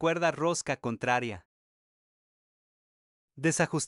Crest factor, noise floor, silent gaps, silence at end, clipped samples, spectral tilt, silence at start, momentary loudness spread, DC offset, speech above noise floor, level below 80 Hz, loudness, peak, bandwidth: 20 dB; under -90 dBFS; 1.45-3.28 s; 0 s; under 0.1%; -4.5 dB/octave; 0 s; 7 LU; under 0.1%; over 61 dB; -68 dBFS; -30 LUFS; -12 dBFS; 12 kHz